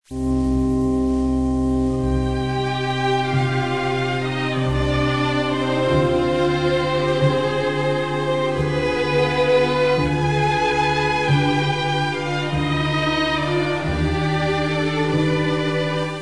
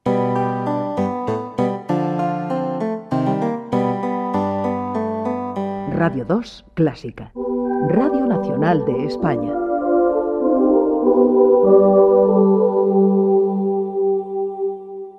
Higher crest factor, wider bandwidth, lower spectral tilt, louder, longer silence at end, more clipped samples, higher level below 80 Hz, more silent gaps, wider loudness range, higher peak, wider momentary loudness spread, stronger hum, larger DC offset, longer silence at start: about the same, 14 dB vs 16 dB; first, 10.5 kHz vs 7 kHz; second, -6.5 dB/octave vs -9.5 dB/octave; about the same, -20 LUFS vs -18 LUFS; about the same, 0 s vs 0 s; neither; first, -34 dBFS vs -52 dBFS; neither; second, 2 LU vs 7 LU; second, -6 dBFS vs -2 dBFS; second, 4 LU vs 10 LU; neither; first, 0.8% vs under 0.1%; about the same, 0 s vs 0.05 s